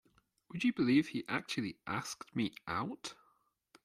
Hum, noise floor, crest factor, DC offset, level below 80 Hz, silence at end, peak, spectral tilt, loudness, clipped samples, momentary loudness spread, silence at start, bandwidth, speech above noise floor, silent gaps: none; -75 dBFS; 20 dB; under 0.1%; -74 dBFS; 0.7 s; -18 dBFS; -5 dB/octave; -36 LUFS; under 0.1%; 13 LU; 0.55 s; 14 kHz; 39 dB; none